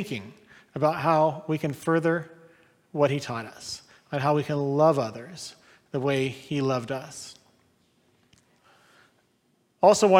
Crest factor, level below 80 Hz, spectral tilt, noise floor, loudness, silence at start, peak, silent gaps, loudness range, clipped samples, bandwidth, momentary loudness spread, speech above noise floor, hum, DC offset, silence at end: 22 dB; -70 dBFS; -5.5 dB/octave; -68 dBFS; -26 LUFS; 0 s; -6 dBFS; none; 6 LU; under 0.1%; 16.5 kHz; 18 LU; 44 dB; none; under 0.1%; 0 s